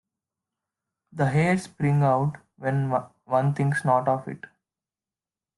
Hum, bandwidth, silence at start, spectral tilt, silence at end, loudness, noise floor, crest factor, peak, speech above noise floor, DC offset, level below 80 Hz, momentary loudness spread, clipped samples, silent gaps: none; 11.5 kHz; 1.15 s; -8 dB/octave; 1.2 s; -25 LUFS; under -90 dBFS; 18 dB; -8 dBFS; over 67 dB; under 0.1%; -62 dBFS; 10 LU; under 0.1%; none